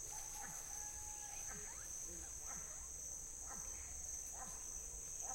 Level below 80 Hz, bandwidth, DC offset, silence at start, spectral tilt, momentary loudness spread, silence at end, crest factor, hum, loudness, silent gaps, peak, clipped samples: -60 dBFS; 16.5 kHz; under 0.1%; 0 s; -1 dB/octave; 1 LU; 0 s; 16 dB; none; -47 LUFS; none; -34 dBFS; under 0.1%